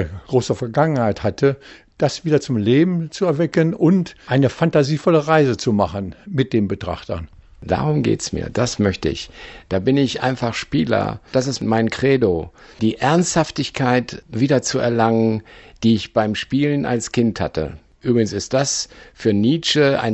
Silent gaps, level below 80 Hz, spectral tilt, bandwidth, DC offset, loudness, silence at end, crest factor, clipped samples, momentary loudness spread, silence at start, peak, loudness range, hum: none; -44 dBFS; -5.5 dB/octave; 8.4 kHz; under 0.1%; -19 LUFS; 0 s; 18 dB; under 0.1%; 9 LU; 0 s; -2 dBFS; 4 LU; none